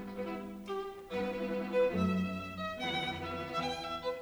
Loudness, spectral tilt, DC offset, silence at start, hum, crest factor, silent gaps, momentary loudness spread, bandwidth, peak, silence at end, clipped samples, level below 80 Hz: -36 LUFS; -6 dB/octave; under 0.1%; 0 s; none; 16 dB; none; 9 LU; over 20 kHz; -20 dBFS; 0 s; under 0.1%; -60 dBFS